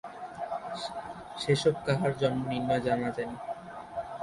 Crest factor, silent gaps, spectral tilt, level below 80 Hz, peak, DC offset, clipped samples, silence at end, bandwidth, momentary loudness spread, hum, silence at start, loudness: 18 dB; none; -6 dB/octave; -60 dBFS; -14 dBFS; under 0.1%; under 0.1%; 0 s; 11.5 kHz; 14 LU; none; 0.05 s; -31 LUFS